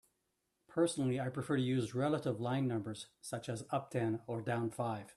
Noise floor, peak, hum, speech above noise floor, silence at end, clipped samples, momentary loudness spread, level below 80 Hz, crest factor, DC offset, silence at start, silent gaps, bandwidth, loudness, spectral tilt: -83 dBFS; -20 dBFS; none; 47 dB; 0.05 s; under 0.1%; 9 LU; -74 dBFS; 16 dB; under 0.1%; 0.7 s; none; 12.5 kHz; -37 LUFS; -6.5 dB/octave